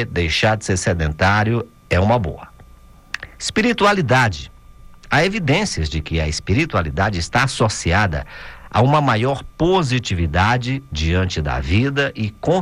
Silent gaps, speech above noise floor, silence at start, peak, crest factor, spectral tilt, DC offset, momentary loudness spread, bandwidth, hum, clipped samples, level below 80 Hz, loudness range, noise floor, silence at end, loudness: none; 27 dB; 0 s; -6 dBFS; 14 dB; -5 dB/octave; under 0.1%; 9 LU; 13 kHz; none; under 0.1%; -32 dBFS; 2 LU; -45 dBFS; 0 s; -18 LUFS